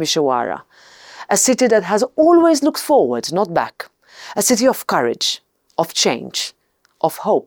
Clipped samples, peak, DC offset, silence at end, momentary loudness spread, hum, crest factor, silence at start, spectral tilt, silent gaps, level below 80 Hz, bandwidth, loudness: under 0.1%; -2 dBFS; under 0.1%; 0.05 s; 14 LU; none; 16 dB; 0 s; -3 dB/octave; none; -62 dBFS; over 20 kHz; -17 LUFS